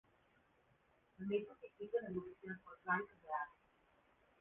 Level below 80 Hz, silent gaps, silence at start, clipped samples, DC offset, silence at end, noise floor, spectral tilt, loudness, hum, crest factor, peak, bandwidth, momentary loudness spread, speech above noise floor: -80 dBFS; none; 1.2 s; under 0.1%; under 0.1%; 0.9 s; -75 dBFS; -1 dB/octave; -45 LUFS; none; 22 dB; -26 dBFS; 3.8 kHz; 11 LU; 31 dB